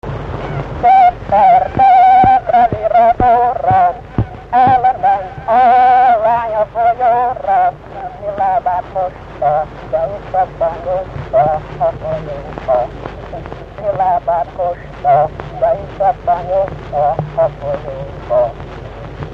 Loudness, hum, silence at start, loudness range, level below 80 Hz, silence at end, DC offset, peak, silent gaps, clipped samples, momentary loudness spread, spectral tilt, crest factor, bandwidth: -13 LUFS; none; 0.05 s; 8 LU; -34 dBFS; 0 s; under 0.1%; 0 dBFS; none; under 0.1%; 15 LU; -8 dB/octave; 14 dB; 5.8 kHz